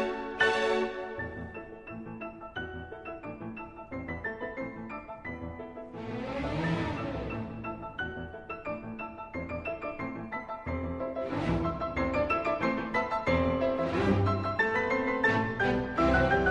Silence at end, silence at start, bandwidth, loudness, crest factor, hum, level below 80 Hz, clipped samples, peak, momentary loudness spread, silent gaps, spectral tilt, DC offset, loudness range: 0 s; 0 s; 10.5 kHz; -32 LUFS; 20 dB; none; -46 dBFS; under 0.1%; -12 dBFS; 15 LU; none; -7 dB/octave; under 0.1%; 11 LU